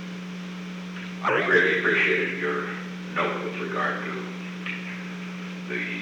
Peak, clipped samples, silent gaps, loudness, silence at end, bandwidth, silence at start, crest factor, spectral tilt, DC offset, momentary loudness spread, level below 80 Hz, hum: -8 dBFS; under 0.1%; none; -26 LUFS; 0 s; 11 kHz; 0 s; 20 dB; -5.5 dB/octave; under 0.1%; 15 LU; -68 dBFS; none